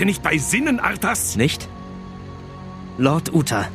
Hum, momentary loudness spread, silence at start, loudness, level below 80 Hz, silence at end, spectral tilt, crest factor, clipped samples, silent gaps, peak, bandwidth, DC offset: none; 18 LU; 0 s; -19 LUFS; -42 dBFS; 0 s; -4.5 dB/octave; 20 dB; under 0.1%; none; -2 dBFS; 15 kHz; under 0.1%